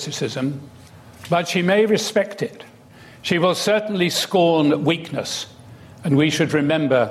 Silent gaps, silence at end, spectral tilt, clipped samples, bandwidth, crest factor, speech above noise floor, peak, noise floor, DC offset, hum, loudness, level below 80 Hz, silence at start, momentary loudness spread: none; 0 s; -5 dB/octave; under 0.1%; 15.5 kHz; 14 dB; 26 dB; -6 dBFS; -45 dBFS; under 0.1%; none; -20 LUFS; -62 dBFS; 0 s; 12 LU